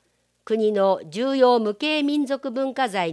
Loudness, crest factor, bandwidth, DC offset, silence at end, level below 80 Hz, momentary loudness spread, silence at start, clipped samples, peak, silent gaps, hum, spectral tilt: -22 LUFS; 16 dB; 11 kHz; under 0.1%; 0 s; -80 dBFS; 8 LU; 0.45 s; under 0.1%; -6 dBFS; none; none; -5 dB/octave